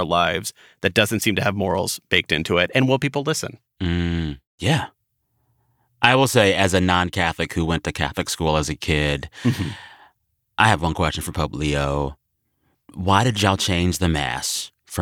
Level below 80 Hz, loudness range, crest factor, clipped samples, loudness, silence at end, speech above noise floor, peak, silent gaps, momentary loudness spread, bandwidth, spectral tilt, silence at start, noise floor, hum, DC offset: -42 dBFS; 4 LU; 20 dB; under 0.1%; -21 LUFS; 0 s; 50 dB; -2 dBFS; 4.47-4.58 s; 10 LU; 18.5 kHz; -4.5 dB/octave; 0 s; -70 dBFS; none; under 0.1%